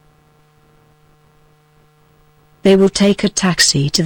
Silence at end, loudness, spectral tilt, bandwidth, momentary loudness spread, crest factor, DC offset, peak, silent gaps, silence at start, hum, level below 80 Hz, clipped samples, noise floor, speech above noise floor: 0 s; -13 LUFS; -4 dB/octave; 18.5 kHz; 4 LU; 16 dB; under 0.1%; -2 dBFS; none; 2.65 s; none; -46 dBFS; under 0.1%; -52 dBFS; 40 dB